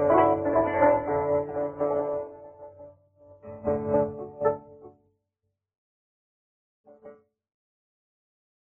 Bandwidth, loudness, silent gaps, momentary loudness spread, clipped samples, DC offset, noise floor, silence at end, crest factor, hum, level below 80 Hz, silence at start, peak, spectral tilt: 3.2 kHz; -26 LUFS; 5.78-6.84 s; 23 LU; under 0.1%; under 0.1%; -82 dBFS; 1.6 s; 20 dB; none; -58 dBFS; 0 s; -8 dBFS; -10 dB/octave